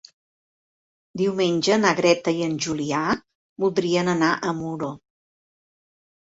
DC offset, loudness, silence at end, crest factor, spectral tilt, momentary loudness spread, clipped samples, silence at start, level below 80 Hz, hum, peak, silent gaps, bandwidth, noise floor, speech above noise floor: under 0.1%; -22 LUFS; 1.45 s; 20 dB; -4.5 dB/octave; 11 LU; under 0.1%; 1.15 s; -62 dBFS; none; -4 dBFS; 3.35-3.56 s; 8 kHz; under -90 dBFS; over 68 dB